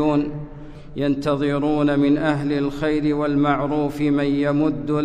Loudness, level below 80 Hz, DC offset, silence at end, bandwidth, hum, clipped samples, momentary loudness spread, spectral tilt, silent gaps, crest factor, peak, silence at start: -21 LUFS; -42 dBFS; under 0.1%; 0 s; 9.4 kHz; none; under 0.1%; 9 LU; -8 dB/octave; none; 12 dB; -8 dBFS; 0 s